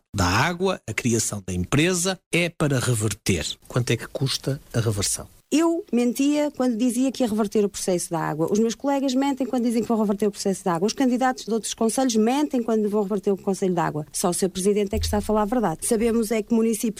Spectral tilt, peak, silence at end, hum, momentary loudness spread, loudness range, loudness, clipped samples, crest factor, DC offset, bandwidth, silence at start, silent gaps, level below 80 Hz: -5 dB/octave; -10 dBFS; 0 s; none; 4 LU; 1 LU; -23 LUFS; under 0.1%; 14 dB; under 0.1%; 16 kHz; 0.15 s; 2.26-2.31 s; -46 dBFS